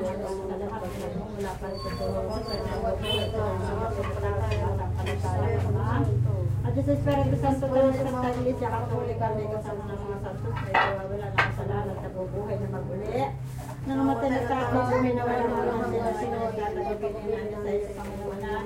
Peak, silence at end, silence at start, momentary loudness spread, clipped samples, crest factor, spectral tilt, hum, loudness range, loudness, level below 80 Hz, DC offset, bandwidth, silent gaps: -8 dBFS; 0 s; 0 s; 9 LU; under 0.1%; 20 dB; -7 dB/octave; none; 4 LU; -28 LUFS; -42 dBFS; under 0.1%; 16 kHz; none